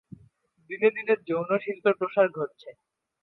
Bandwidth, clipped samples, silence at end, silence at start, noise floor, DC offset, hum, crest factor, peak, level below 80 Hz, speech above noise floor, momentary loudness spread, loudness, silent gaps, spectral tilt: 4.4 kHz; under 0.1%; 0.55 s; 0.7 s; -61 dBFS; under 0.1%; none; 20 dB; -8 dBFS; -76 dBFS; 35 dB; 11 LU; -26 LUFS; none; -8.5 dB/octave